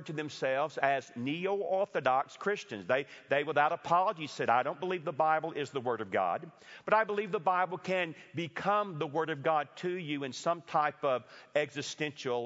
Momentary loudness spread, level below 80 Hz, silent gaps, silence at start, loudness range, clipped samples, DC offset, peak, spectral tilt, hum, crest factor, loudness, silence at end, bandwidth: 7 LU; -82 dBFS; none; 0 s; 2 LU; under 0.1%; under 0.1%; -12 dBFS; -3 dB/octave; none; 22 dB; -32 LUFS; 0 s; 7.6 kHz